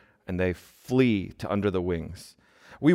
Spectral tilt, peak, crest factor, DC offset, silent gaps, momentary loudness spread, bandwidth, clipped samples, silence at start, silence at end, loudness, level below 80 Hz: -7.5 dB/octave; -8 dBFS; 20 dB; under 0.1%; none; 15 LU; 15.5 kHz; under 0.1%; 0.3 s; 0 s; -27 LUFS; -56 dBFS